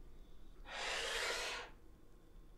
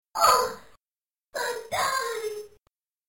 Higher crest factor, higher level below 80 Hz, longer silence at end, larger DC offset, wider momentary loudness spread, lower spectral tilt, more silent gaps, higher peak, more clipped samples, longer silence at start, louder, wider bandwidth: about the same, 18 dB vs 18 dB; about the same, -58 dBFS vs -60 dBFS; second, 0 s vs 0.6 s; neither; about the same, 20 LU vs 18 LU; about the same, -0.5 dB/octave vs -0.5 dB/octave; second, none vs 0.97-1.01 s; second, -28 dBFS vs -10 dBFS; neither; second, 0 s vs 0.15 s; second, -41 LUFS vs -26 LUFS; about the same, 16 kHz vs 17 kHz